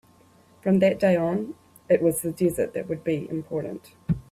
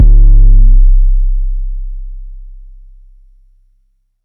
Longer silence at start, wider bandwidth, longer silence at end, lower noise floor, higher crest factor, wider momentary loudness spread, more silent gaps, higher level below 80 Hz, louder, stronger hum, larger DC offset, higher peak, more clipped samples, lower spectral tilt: first, 0.65 s vs 0 s; first, 15.5 kHz vs 0.5 kHz; second, 0.1 s vs 1.8 s; about the same, -56 dBFS vs -56 dBFS; first, 18 dB vs 8 dB; second, 13 LU vs 22 LU; neither; second, -54 dBFS vs -8 dBFS; second, -25 LUFS vs -12 LUFS; neither; neither; second, -6 dBFS vs 0 dBFS; neither; second, -6.5 dB/octave vs -13 dB/octave